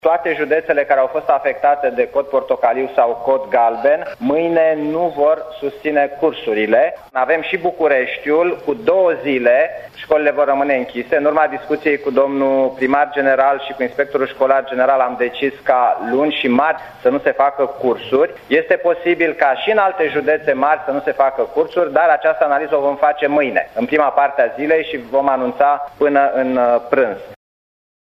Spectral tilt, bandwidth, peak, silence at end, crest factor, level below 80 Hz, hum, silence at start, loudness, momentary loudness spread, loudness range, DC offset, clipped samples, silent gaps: -6.5 dB/octave; 13.5 kHz; 0 dBFS; 0.75 s; 16 dB; -56 dBFS; none; 0.05 s; -16 LUFS; 5 LU; 1 LU; under 0.1%; under 0.1%; none